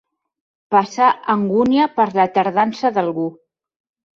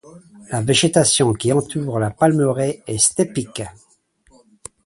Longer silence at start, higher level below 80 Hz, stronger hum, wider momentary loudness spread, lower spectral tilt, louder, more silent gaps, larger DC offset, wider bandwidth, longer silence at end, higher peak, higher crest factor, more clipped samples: first, 0.7 s vs 0.05 s; second, -60 dBFS vs -50 dBFS; neither; second, 5 LU vs 12 LU; first, -6.5 dB/octave vs -4 dB/octave; about the same, -17 LUFS vs -18 LUFS; neither; neither; second, 7.6 kHz vs 11.5 kHz; second, 0.85 s vs 1.15 s; about the same, -2 dBFS vs 0 dBFS; about the same, 16 dB vs 20 dB; neither